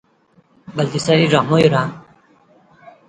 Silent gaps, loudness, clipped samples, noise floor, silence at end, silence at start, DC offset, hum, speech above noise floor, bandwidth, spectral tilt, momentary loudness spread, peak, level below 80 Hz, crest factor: none; -16 LUFS; under 0.1%; -56 dBFS; 1.1 s; 0.7 s; under 0.1%; none; 41 dB; 9.4 kHz; -6 dB/octave; 12 LU; 0 dBFS; -54 dBFS; 18 dB